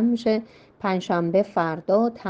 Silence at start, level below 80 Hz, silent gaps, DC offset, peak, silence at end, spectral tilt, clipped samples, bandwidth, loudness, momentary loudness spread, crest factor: 0 s; -64 dBFS; none; under 0.1%; -8 dBFS; 0 s; -7.5 dB/octave; under 0.1%; 7.8 kHz; -24 LUFS; 5 LU; 16 dB